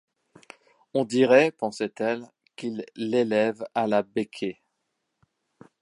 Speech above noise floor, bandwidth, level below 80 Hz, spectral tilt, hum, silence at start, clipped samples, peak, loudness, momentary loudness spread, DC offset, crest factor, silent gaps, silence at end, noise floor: 54 dB; 11 kHz; -76 dBFS; -5.5 dB/octave; none; 0.95 s; under 0.1%; -6 dBFS; -25 LUFS; 15 LU; under 0.1%; 22 dB; none; 1.3 s; -79 dBFS